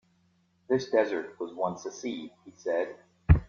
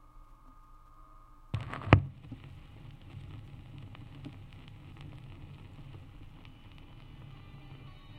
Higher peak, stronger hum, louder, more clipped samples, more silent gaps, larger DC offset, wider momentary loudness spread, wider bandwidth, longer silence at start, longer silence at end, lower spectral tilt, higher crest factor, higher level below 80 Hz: second, -6 dBFS vs 0 dBFS; neither; about the same, -31 LUFS vs -32 LUFS; neither; neither; neither; second, 13 LU vs 22 LU; second, 7 kHz vs 8.6 kHz; first, 0.7 s vs 0 s; about the same, 0.05 s vs 0 s; about the same, -7 dB/octave vs -8 dB/octave; second, 24 dB vs 38 dB; first, -38 dBFS vs -50 dBFS